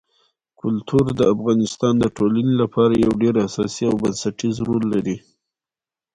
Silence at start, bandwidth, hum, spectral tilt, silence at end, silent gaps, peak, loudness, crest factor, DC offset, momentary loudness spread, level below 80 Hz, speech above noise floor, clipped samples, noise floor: 0.65 s; 11 kHz; none; -6.5 dB/octave; 0.95 s; none; -4 dBFS; -20 LUFS; 16 dB; under 0.1%; 7 LU; -48 dBFS; over 71 dB; under 0.1%; under -90 dBFS